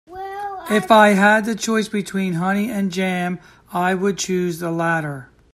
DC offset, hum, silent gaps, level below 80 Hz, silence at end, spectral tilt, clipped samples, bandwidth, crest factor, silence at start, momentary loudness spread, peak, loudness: under 0.1%; none; none; -56 dBFS; 0.3 s; -5 dB/octave; under 0.1%; 15 kHz; 18 dB; 0.1 s; 17 LU; 0 dBFS; -19 LUFS